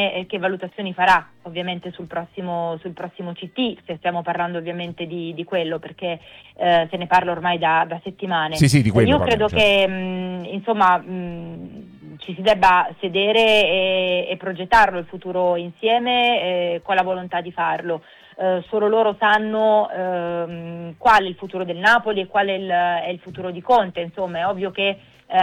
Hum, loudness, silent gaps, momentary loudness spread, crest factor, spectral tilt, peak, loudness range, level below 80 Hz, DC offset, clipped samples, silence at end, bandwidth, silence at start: none; -20 LUFS; none; 14 LU; 18 dB; -5.5 dB/octave; -2 dBFS; 8 LU; -50 dBFS; under 0.1%; under 0.1%; 0 s; 16 kHz; 0 s